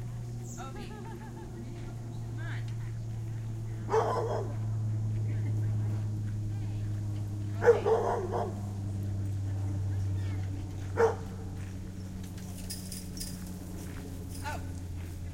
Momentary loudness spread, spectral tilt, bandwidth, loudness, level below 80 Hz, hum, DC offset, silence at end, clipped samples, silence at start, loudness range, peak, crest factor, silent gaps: 12 LU; -6.5 dB/octave; 16.5 kHz; -34 LUFS; -48 dBFS; none; under 0.1%; 0 s; under 0.1%; 0 s; 9 LU; -10 dBFS; 22 dB; none